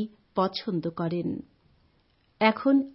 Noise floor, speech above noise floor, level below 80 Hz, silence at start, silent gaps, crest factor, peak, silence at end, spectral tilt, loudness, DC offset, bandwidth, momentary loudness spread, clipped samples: -66 dBFS; 40 dB; -66 dBFS; 0 s; none; 22 dB; -6 dBFS; 0.05 s; -10 dB/octave; -27 LUFS; under 0.1%; 5.8 kHz; 9 LU; under 0.1%